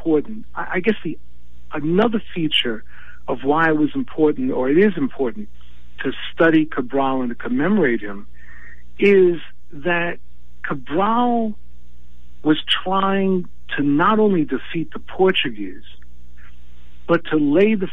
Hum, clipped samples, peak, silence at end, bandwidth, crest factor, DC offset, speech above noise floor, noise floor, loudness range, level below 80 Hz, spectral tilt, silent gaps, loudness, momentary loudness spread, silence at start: 60 Hz at -45 dBFS; under 0.1%; -2 dBFS; 0 s; 9.8 kHz; 16 dB; 6%; 28 dB; -46 dBFS; 3 LU; -48 dBFS; -7.5 dB/octave; none; -19 LUFS; 16 LU; 0 s